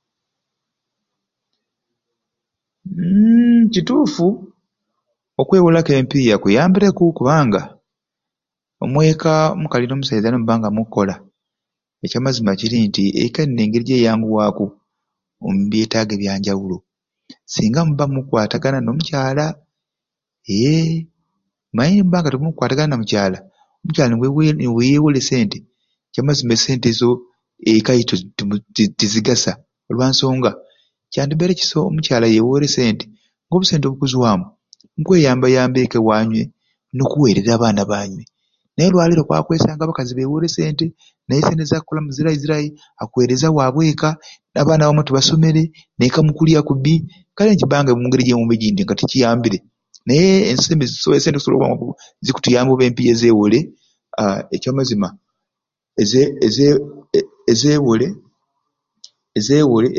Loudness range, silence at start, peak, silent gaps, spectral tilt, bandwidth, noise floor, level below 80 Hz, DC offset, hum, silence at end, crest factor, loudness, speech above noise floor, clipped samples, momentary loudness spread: 4 LU; 2.85 s; 0 dBFS; none; -6 dB/octave; 7.4 kHz; -85 dBFS; -48 dBFS; under 0.1%; none; 0 s; 16 dB; -16 LUFS; 70 dB; under 0.1%; 11 LU